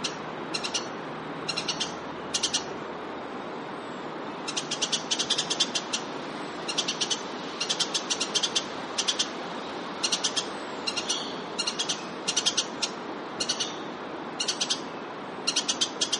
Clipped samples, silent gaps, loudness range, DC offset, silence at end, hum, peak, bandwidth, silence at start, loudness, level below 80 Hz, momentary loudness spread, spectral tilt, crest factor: under 0.1%; none; 3 LU; under 0.1%; 0 s; none; -10 dBFS; 11.5 kHz; 0 s; -29 LUFS; -70 dBFS; 11 LU; -1 dB/octave; 22 dB